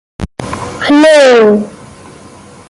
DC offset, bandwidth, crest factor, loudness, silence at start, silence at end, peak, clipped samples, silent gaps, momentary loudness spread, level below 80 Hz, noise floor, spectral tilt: under 0.1%; 11.5 kHz; 10 dB; -7 LUFS; 0.2 s; 0.95 s; 0 dBFS; under 0.1%; none; 19 LU; -38 dBFS; -35 dBFS; -4.5 dB/octave